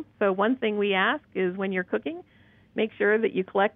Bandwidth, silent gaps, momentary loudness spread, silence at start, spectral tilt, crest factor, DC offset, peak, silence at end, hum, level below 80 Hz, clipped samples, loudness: 3.9 kHz; none; 8 LU; 0 s; -9 dB/octave; 18 dB; under 0.1%; -8 dBFS; 0.05 s; none; -70 dBFS; under 0.1%; -26 LUFS